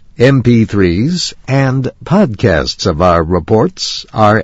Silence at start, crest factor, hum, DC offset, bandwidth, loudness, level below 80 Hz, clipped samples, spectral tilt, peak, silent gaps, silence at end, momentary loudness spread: 0.2 s; 12 dB; none; under 0.1%; 8 kHz; -12 LUFS; -32 dBFS; 0.4%; -6 dB/octave; 0 dBFS; none; 0 s; 5 LU